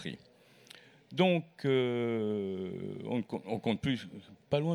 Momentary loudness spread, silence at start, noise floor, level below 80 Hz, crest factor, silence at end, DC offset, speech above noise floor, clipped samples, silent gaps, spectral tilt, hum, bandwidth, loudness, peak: 20 LU; 0 s; -57 dBFS; -68 dBFS; 20 dB; 0 s; under 0.1%; 25 dB; under 0.1%; none; -7 dB/octave; none; 11.5 kHz; -33 LUFS; -14 dBFS